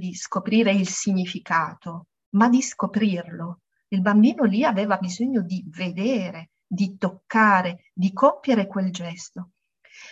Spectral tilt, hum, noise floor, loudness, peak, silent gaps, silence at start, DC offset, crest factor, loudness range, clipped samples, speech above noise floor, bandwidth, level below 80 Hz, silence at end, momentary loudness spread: -5.5 dB/octave; none; -51 dBFS; -22 LUFS; -4 dBFS; 2.26-2.32 s; 0 s; under 0.1%; 18 dB; 2 LU; under 0.1%; 29 dB; 8.2 kHz; -70 dBFS; 0 s; 16 LU